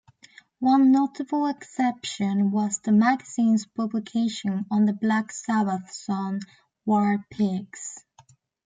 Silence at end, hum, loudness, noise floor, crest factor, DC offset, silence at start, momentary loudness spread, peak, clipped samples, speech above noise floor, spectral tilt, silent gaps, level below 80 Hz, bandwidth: 0.65 s; none; -24 LUFS; -58 dBFS; 16 dB; under 0.1%; 0.6 s; 11 LU; -8 dBFS; under 0.1%; 34 dB; -5.5 dB/octave; none; -72 dBFS; 9.4 kHz